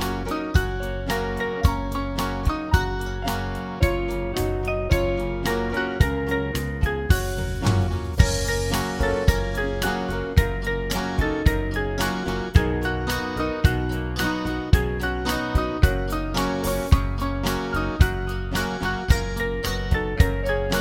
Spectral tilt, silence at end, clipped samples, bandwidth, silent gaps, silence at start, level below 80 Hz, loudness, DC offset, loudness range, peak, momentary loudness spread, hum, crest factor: -5.5 dB/octave; 0 s; under 0.1%; 17 kHz; none; 0 s; -28 dBFS; -24 LUFS; under 0.1%; 2 LU; -2 dBFS; 5 LU; none; 20 dB